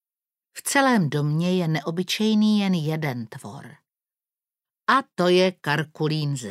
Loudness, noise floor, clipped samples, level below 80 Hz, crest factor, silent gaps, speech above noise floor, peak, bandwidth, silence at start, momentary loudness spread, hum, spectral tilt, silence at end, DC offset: -22 LUFS; under -90 dBFS; under 0.1%; -74 dBFS; 20 dB; none; over 68 dB; -4 dBFS; 16 kHz; 0.55 s; 15 LU; none; -5.5 dB/octave; 0 s; under 0.1%